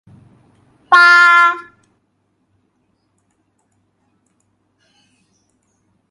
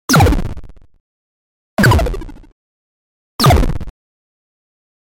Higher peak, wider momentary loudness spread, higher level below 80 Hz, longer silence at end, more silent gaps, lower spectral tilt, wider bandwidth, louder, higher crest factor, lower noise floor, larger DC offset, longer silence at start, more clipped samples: about the same, 0 dBFS vs -2 dBFS; second, 10 LU vs 23 LU; second, -70 dBFS vs -24 dBFS; first, 4.5 s vs 1.15 s; second, none vs 1.00-1.77 s, 2.52-3.39 s; second, -0.5 dB/octave vs -5 dB/octave; second, 11.5 kHz vs 17 kHz; first, -9 LUFS vs -14 LUFS; about the same, 18 dB vs 14 dB; second, -65 dBFS vs under -90 dBFS; neither; first, 0.9 s vs 0.1 s; neither